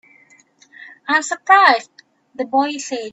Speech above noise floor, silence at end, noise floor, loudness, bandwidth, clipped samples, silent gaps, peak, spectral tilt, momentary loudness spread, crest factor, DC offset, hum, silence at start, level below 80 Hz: 36 dB; 0.05 s; -52 dBFS; -16 LUFS; 8.4 kHz; under 0.1%; none; 0 dBFS; -0.5 dB/octave; 15 LU; 20 dB; under 0.1%; none; 0.8 s; -76 dBFS